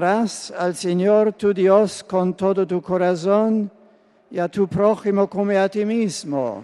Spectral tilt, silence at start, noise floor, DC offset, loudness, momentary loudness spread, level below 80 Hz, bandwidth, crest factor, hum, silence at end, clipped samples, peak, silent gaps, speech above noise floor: -6 dB/octave; 0 s; -54 dBFS; under 0.1%; -20 LUFS; 8 LU; -60 dBFS; 12 kHz; 16 dB; none; 0 s; under 0.1%; -2 dBFS; none; 35 dB